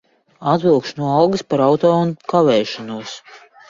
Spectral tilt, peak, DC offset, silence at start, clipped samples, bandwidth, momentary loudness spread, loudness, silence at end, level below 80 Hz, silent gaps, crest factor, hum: -6.5 dB/octave; 0 dBFS; under 0.1%; 0.4 s; under 0.1%; 7.6 kHz; 14 LU; -17 LUFS; 0.3 s; -58 dBFS; none; 16 dB; none